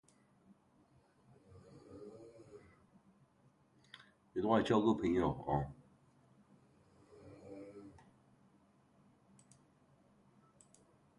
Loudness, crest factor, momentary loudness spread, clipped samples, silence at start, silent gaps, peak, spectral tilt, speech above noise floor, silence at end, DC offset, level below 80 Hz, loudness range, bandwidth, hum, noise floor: -35 LUFS; 26 dB; 28 LU; under 0.1%; 1.55 s; none; -16 dBFS; -7.5 dB/octave; 37 dB; 3.3 s; under 0.1%; -64 dBFS; 23 LU; 11 kHz; none; -71 dBFS